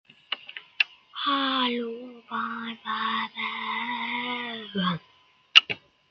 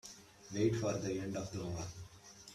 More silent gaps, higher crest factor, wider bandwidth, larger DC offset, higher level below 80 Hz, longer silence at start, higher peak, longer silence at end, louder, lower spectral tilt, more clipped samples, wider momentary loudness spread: neither; first, 26 dB vs 20 dB; about the same, 13 kHz vs 14 kHz; neither; second, -76 dBFS vs -64 dBFS; first, 0.3 s vs 0.05 s; first, -2 dBFS vs -20 dBFS; first, 0.3 s vs 0 s; first, -26 LUFS vs -39 LUFS; second, -3.5 dB/octave vs -5.5 dB/octave; neither; second, 17 LU vs 20 LU